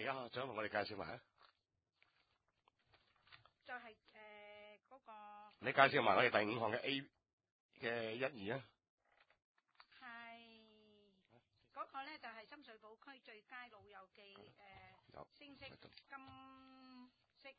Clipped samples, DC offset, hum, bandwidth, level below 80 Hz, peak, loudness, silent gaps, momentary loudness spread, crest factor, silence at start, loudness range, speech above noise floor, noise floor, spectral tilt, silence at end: under 0.1%; under 0.1%; none; 4.9 kHz; -82 dBFS; -14 dBFS; -40 LUFS; 7.33-7.38 s, 7.52-7.69 s, 8.89-8.98 s, 9.44-9.55 s; 27 LU; 32 dB; 0 s; 22 LU; 45 dB; -88 dBFS; -2 dB/octave; 0.05 s